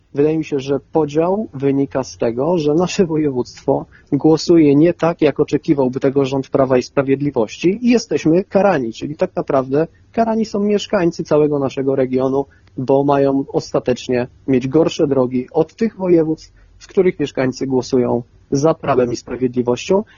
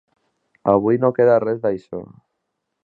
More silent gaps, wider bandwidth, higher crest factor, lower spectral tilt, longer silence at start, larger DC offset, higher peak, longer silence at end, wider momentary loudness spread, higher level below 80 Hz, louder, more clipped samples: neither; first, 7.4 kHz vs 4.5 kHz; about the same, 16 dB vs 20 dB; second, -7 dB/octave vs -10.5 dB/octave; second, 0.15 s vs 0.65 s; neither; about the same, 0 dBFS vs -2 dBFS; second, 0.15 s vs 0.8 s; second, 6 LU vs 15 LU; first, -48 dBFS vs -58 dBFS; about the same, -17 LUFS vs -18 LUFS; neither